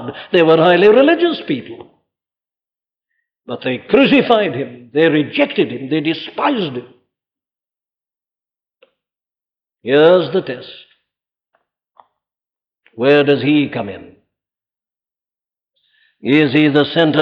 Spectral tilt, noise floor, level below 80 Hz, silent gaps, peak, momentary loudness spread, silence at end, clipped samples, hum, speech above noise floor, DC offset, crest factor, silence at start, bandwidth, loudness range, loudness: -8 dB/octave; under -90 dBFS; -60 dBFS; none; -2 dBFS; 17 LU; 0 s; under 0.1%; none; over 76 dB; under 0.1%; 16 dB; 0 s; 5.6 kHz; 6 LU; -14 LUFS